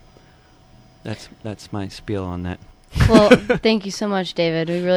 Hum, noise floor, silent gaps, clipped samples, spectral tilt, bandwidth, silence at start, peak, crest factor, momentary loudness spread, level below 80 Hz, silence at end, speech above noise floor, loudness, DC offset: none; -50 dBFS; none; under 0.1%; -6 dB/octave; 14 kHz; 1.05 s; 0 dBFS; 20 dB; 20 LU; -34 dBFS; 0 s; 32 dB; -18 LUFS; under 0.1%